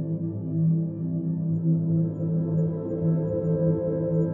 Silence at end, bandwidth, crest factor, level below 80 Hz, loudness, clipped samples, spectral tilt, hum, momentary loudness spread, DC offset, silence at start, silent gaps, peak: 0 s; 1.8 kHz; 12 dB; -58 dBFS; -26 LUFS; under 0.1%; -14.5 dB/octave; none; 5 LU; under 0.1%; 0 s; none; -12 dBFS